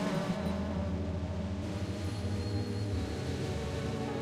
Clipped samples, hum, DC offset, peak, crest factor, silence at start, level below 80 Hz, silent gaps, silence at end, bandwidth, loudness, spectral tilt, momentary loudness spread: under 0.1%; none; under 0.1%; -22 dBFS; 14 dB; 0 s; -46 dBFS; none; 0 s; 13.5 kHz; -36 LUFS; -6.5 dB/octave; 3 LU